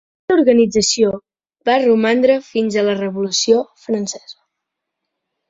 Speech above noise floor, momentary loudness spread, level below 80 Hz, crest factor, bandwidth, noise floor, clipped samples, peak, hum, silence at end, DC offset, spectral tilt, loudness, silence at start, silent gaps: 64 dB; 10 LU; -56 dBFS; 16 dB; 8.2 kHz; -79 dBFS; under 0.1%; 0 dBFS; none; 1.2 s; under 0.1%; -3.5 dB/octave; -16 LUFS; 0.3 s; none